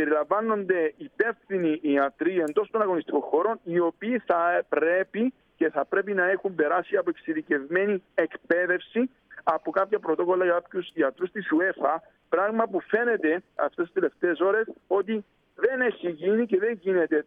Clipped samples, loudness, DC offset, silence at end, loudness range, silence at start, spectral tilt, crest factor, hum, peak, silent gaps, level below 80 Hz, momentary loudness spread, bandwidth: under 0.1%; -26 LUFS; under 0.1%; 0.05 s; 1 LU; 0 s; -7.5 dB/octave; 18 dB; none; -8 dBFS; none; -74 dBFS; 5 LU; 4 kHz